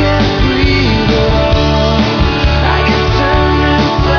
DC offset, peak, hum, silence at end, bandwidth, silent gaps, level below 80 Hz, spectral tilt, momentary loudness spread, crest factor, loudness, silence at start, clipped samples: under 0.1%; 0 dBFS; none; 0 s; 5.4 kHz; none; -16 dBFS; -6.5 dB/octave; 1 LU; 10 dB; -11 LUFS; 0 s; under 0.1%